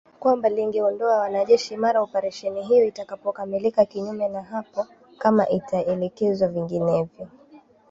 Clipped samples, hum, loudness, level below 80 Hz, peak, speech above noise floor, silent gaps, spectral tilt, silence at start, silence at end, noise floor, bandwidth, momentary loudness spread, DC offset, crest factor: under 0.1%; none; -23 LUFS; -64 dBFS; -4 dBFS; 29 dB; none; -6.5 dB/octave; 0.2 s; 0.35 s; -52 dBFS; 7.8 kHz; 11 LU; under 0.1%; 18 dB